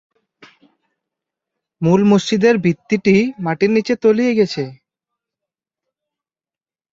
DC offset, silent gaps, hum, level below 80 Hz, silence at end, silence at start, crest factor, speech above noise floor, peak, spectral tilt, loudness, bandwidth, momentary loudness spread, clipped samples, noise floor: under 0.1%; none; none; -58 dBFS; 2.2 s; 1.8 s; 16 dB; over 75 dB; -2 dBFS; -6.5 dB/octave; -16 LUFS; 7.8 kHz; 7 LU; under 0.1%; under -90 dBFS